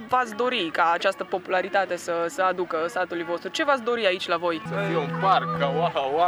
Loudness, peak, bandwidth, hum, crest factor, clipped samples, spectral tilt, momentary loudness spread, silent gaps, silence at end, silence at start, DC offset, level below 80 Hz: -25 LUFS; -6 dBFS; over 20 kHz; none; 18 dB; under 0.1%; -4.5 dB/octave; 6 LU; none; 0 s; 0 s; under 0.1%; -70 dBFS